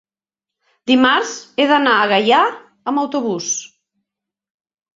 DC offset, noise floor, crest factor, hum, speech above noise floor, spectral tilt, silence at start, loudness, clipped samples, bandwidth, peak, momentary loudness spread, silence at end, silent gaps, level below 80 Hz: under 0.1%; -87 dBFS; 18 dB; none; 72 dB; -2.5 dB/octave; 0.85 s; -16 LUFS; under 0.1%; 7.8 kHz; 0 dBFS; 10 LU; 1.3 s; none; -66 dBFS